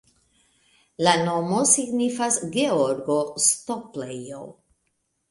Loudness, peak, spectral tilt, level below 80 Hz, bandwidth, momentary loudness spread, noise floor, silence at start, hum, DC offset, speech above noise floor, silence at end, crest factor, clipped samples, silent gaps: -22 LUFS; -2 dBFS; -3 dB/octave; -66 dBFS; 12 kHz; 15 LU; -74 dBFS; 1 s; none; under 0.1%; 51 dB; 0.8 s; 22 dB; under 0.1%; none